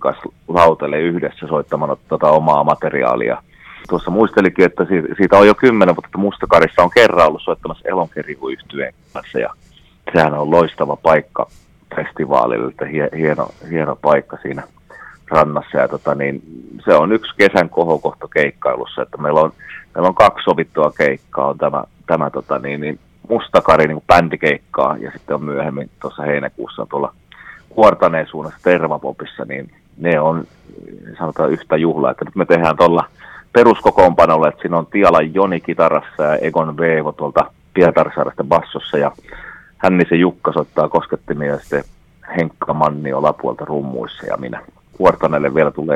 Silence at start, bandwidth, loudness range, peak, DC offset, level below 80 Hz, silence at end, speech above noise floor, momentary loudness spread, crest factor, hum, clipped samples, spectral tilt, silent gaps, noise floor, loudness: 0 s; 12 kHz; 6 LU; 0 dBFS; under 0.1%; -46 dBFS; 0 s; 25 dB; 14 LU; 16 dB; none; 0.1%; -7 dB/octave; none; -40 dBFS; -15 LUFS